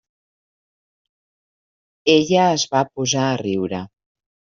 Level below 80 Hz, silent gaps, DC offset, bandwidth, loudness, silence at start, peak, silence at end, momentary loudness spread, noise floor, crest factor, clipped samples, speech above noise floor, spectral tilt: -60 dBFS; none; under 0.1%; 7.6 kHz; -19 LUFS; 2.05 s; -2 dBFS; 0.65 s; 11 LU; under -90 dBFS; 20 dB; under 0.1%; over 72 dB; -4 dB/octave